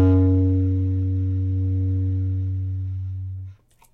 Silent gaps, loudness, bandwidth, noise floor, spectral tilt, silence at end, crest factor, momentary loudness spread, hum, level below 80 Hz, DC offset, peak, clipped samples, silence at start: none; -23 LUFS; 2.2 kHz; -42 dBFS; -12 dB/octave; 0.4 s; 12 dB; 13 LU; none; -44 dBFS; under 0.1%; -10 dBFS; under 0.1%; 0 s